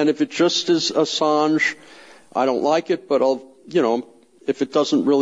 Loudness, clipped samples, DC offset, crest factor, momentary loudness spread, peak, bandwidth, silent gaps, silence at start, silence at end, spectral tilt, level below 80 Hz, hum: -20 LUFS; under 0.1%; under 0.1%; 12 dB; 9 LU; -6 dBFS; 10 kHz; none; 0 s; 0 s; -4 dB/octave; -74 dBFS; none